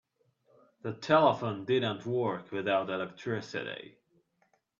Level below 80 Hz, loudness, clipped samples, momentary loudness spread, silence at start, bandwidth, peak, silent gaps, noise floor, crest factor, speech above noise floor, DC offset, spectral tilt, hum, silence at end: -74 dBFS; -31 LUFS; under 0.1%; 16 LU; 0.85 s; 7.4 kHz; -10 dBFS; none; -73 dBFS; 22 dB; 43 dB; under 0.1%; -6.5 dB/octave; none; 0.9 s